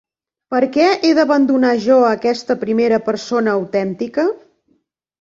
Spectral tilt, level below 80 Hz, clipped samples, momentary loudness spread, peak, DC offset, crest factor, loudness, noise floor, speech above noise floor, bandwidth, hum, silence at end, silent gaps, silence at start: -5.5 dB/octave; -60 dBFS; under 0.1%; 8 LU; -2 dBFS; under 0.1%; 14 dB; -16 LUFS; -63 dBFS; 48 dB; 7.8 kHz; none; 0.85 s; none; 0.5 s